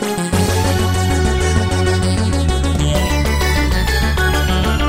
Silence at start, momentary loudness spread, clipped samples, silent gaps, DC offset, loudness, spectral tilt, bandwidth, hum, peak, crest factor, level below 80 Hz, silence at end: 0 s; 1 LU; under 0.1%; none; under 0.1%; -16 LUFS; -5 dB/octave; 16.5 kHz; none; -2 dBFS; 12 dB; -20 dBFS; 0 s